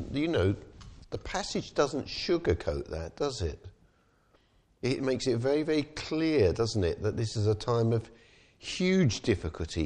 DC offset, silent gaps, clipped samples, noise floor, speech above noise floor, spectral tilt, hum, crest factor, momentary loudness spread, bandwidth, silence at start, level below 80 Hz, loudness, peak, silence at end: under 0.1%; none; under 0.1%; -66 dBFS; 37 dB; -6 dB/octave; none; 16 dB; 10 LU; 10.5 kHz; 0 s; -48 dBFS; -30 LUFS; -14 dBFS; 0 s